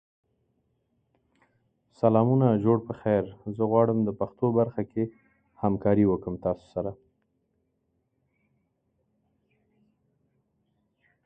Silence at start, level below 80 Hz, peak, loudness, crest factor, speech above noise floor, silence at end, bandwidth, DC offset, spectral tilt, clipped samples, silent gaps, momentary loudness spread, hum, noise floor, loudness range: 2.05 s; -58 dBFS; -6 dBFS; -26 LUFS; 22 dB; 50 dB; 4.3 s; 5 kHz; under 0.1%; -11.5 dB/octave; under 0.1%; none; 10 LU; none; -75 dBFS; 12 LU